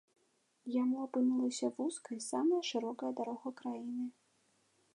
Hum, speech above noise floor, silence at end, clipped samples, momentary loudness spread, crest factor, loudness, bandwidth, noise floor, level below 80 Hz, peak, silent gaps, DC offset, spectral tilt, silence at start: none; 40 dB; 0.85 s; under 0.1%; 10 LU; 16 dB; -37 LUFS; 11.5 kHz; -76 dBFS; under -90 dBFS; -22 dBFS; none; under 0.1%; -3.5 dB/octave; 0.65 s